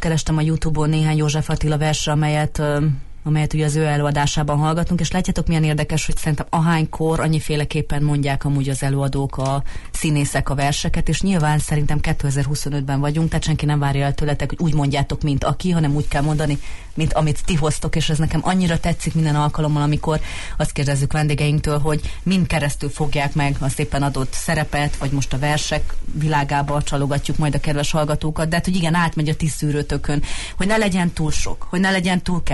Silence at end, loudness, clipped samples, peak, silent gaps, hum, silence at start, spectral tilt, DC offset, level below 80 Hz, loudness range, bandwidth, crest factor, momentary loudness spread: 0 s; -20 LUFS; under 0.1%; -6 dBFS; none; none; 0 s; -5.5 dB/octave; under 0.1%; -28 dBFS; 2 LU; 12 kHz; 12 dB; 5 LU